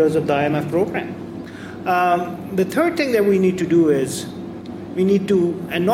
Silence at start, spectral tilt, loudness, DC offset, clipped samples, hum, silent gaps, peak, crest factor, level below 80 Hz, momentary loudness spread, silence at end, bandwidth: 0 s; -6.5 dB/octave; -19 LUFS; under 0.1%; under 0.1%; none; none; -6 dBFS; 12 dB; -54 dBFS; 15 LU; 0 s; 16 kHz